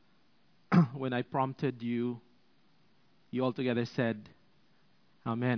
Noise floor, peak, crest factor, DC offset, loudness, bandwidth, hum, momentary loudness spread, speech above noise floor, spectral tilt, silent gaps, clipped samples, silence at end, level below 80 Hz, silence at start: -70 dBFS; -12 dBFS; 22 dB; under 0.1%; -33 LUFS; 5.4 kHz; none; 12 LU; 37 dB; -6.5 dB/octave; none; under 0.1%; 0 s; -76 dBFS; 0.7 s